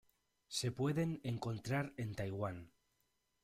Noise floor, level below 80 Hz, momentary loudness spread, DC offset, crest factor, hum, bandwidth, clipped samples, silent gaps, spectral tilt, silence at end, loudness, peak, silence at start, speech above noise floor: -82 dBFS; -68 dBFS; 6 LU; under 0.1%; 16 dB; none; 15.5 kHz; under 0.1%; none; -5.5 dB/octave; 0.75 s; -41 LUFS; -26 dBFS; 0.5 s; 42 dB